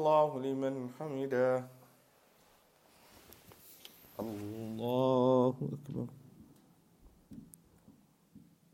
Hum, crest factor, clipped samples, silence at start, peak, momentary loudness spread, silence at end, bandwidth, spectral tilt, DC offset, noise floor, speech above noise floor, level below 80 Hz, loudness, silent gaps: none; 20 dB; under 0.1%; 0 s; -16 dBFS; 26 LU; 0.35 s; 16.5 kHz; -7.5 dB/octave; under 0.1%; -66 dBFS; 34 dB; -74 dBFS; -34 LUFS; none